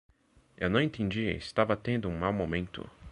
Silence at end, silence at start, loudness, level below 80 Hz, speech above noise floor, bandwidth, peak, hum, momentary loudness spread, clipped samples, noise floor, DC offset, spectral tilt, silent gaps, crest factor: 0 s; 0.6 s; -31 LUFS; -50 dBFS; 31 dB; 11 kHz; -10 dBFS; none; 7 LU; under 0.1%; -61 dBFS; under 0.1%; -7 dB/octave; none; 22 dB